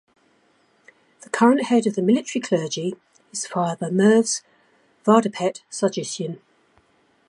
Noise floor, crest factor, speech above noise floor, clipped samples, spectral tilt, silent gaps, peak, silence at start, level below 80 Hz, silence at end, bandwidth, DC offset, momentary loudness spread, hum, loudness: -62 dBFS; 20 dB; 41 dB; under 0.1%; -5 dB/octave; none; -2 dBFS; 1.35 s; -74 dBFS; 0.9 s; 11.5 kHz; under 0.1%; 14 LU; none; -21 LUFS